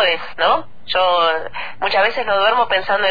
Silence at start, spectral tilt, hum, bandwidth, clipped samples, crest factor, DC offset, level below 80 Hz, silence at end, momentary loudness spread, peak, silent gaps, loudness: 0 s; -4 dB/octave; none; 5 kHz; under 0.1%; 12 dB; 4%; -50 dBFS; 0 s; 7 LU; -4 dBFS; none; -17 LUFS